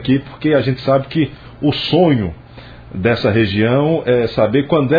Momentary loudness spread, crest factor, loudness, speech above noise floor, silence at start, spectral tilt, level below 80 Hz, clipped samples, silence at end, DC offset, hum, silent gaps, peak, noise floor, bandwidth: 6 LU; 14 dB; -16 LUFS; 22 dB; 0 s; -9 dB/octave; -42 dBFS; under 0.1%; 0 s; under 0.1%; none; none; -2 dBFS; -37 dBFS; 5 kHz